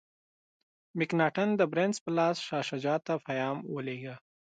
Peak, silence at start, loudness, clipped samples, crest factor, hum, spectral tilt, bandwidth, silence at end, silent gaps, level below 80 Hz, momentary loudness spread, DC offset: -14 dBFS; 0.95 s; -31 LUFS; under 0.1%; 18 dB; none; -5.5 dB/octave; 9.4 kHz; 0.4 s; 2.01-2.06 s; -80 dBFS; 12 LU; under 0.1%